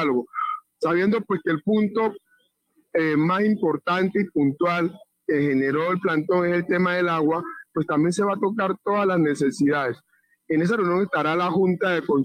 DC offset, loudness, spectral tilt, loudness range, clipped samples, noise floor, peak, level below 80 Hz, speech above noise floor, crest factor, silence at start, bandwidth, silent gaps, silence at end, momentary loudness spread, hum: under 0.1%; -23 LUFS; -7 dB/octave; 1 LU; under 0.1%; -66 dBFS; -12 dBFS; -66 dBFS; 45 dB; 10 dB; 0 s; 14 kHz; none; 0 s; 7 LU; none